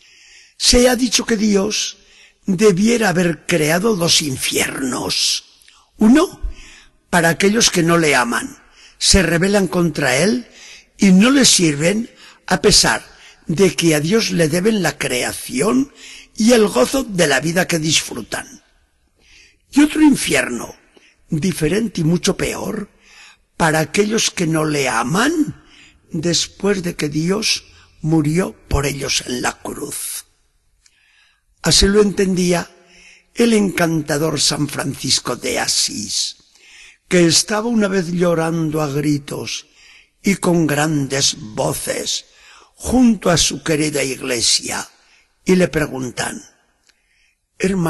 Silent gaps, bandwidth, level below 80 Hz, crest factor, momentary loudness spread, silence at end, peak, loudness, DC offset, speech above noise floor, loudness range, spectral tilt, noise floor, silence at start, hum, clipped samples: none; 12.5 kHz; -38 dBFS; 18 dB; 12 LU; 0 s; 0 dBFS; -16 LUFS; under 0.1%; 44 dB; 5 LU; -3.5 dB/octave; -61 dBFS; 0.6 s; none; under 0.1%